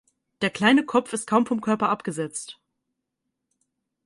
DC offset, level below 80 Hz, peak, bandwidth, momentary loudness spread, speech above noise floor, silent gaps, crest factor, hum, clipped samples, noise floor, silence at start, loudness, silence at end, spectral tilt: under 0.1%; -68 dBFS; -6 dBFS; 11.5 kHz; 12 LU; 58 dB; none; 20 dB; none; under 0.1%; -81 dBFS; 0.4 s; -23 LUFS; 1.55 s; -4.5 dB/octave